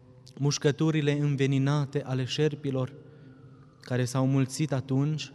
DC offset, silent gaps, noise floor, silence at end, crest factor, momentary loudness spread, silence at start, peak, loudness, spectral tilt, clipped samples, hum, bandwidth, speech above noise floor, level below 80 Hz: under 0.1%; none; -52 dBFS; 0 s; 16 dB; 6 LU; 0.3 s; -12 dBFS; -28 LUFS; -6 dB/octave; under 0.1%; none; 12 kHz; 25 dB; -66 dBFS